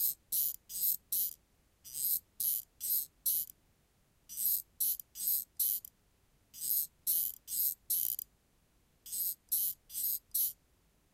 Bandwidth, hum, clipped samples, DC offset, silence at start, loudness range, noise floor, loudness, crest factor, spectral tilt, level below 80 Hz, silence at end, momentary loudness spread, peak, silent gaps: 16.5 kHz; none; under 0.1%; under 0.1%; 0 s; 2 LU; -72 dBFS; -33 LUFS; 22 dB; 1.5 dB/octave; -74 dBFS; 0.6 s; 5 LU; -16 dBFS; none